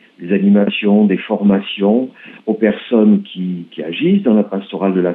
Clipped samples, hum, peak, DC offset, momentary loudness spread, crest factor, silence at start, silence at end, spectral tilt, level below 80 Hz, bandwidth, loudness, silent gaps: under 0.1%; none; 0 dBFS; under 0.1%; 11 LU; 14 dB; 0.2 s; 0 s; -10.5 dB/octave; -60 dBFS; 3.9 kHz; -15 LUFS; none